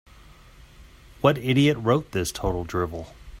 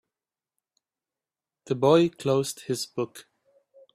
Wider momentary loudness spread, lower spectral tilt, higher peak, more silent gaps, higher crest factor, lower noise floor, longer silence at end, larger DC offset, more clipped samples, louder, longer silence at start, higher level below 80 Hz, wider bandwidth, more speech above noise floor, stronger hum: about the same, 11 LU vs 13 LU; about the same, -6 dB/octave vs -5.5 dB/octave; about the same, -4 dBFS vs -6 dBFS; neither; about the same, 20 dB vs 22 dB; second, -49 dBFS vs under -90 dBFS; second, 0 s vs 0.75 s; neither; neither; about the same, -24 LUFS vs -25 LUFS; second, 0.6 s vs 1.65 s; first, -44 dBFS vs -70 dBFS; about the same, 16 kHz vs 15 kHz; second, 26 dB vs over 65 dB; neither